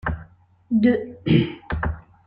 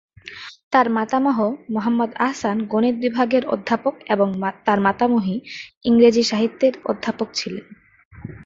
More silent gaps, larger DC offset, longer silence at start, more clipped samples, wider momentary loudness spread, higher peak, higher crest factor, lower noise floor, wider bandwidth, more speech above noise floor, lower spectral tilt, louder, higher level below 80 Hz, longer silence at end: second, none vs 0.63-0.71 s, 5.77-5.81 s, 8.05-8.11 s; neither; second, 0.05 s vs 0.25 s; neither; second, 11 LU vs 15 LU; about the same, -4 dBFS vs -2 dBFS; about the same, 20 dB vs 18 dB; first, -49 dBFS vs -39 dBFS; second, 5.2 kHz vs 7.8 kHz; first, 29 dB vs 19 dB; first, -10 dB/octave vs -5.5 dB/octave; about the same, -22 LUFS vs -20 LUFS; first, -38 dBFS vs -58 dBFS; first, 0.25 s vs 0 s